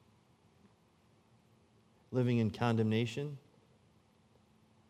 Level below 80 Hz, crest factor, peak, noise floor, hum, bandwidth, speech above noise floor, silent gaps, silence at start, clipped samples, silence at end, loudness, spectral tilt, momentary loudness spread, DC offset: -76 dBFS; 22 dB; -16 dBFS; -69 dBFS; none; 11 kHz; 36 dB; none; 2.1 s; under 0.1%; 1.5 s; -34 LUFS; -7.5 dB/octave; 12 LU; under 0.1%